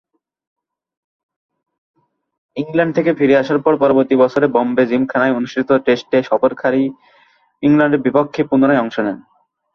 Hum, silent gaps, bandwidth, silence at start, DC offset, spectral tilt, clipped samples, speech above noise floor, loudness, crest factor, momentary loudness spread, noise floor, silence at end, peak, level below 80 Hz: none; none; 6.4 kHz; 2.55 s; under 0.1%; -7.5 dB/octave; under 0.1%; 39 dB; -15 LUFS; 16 dB; 7 LU; -54 dBFS; 0.55 s; 0 dBFS; -58 dBFS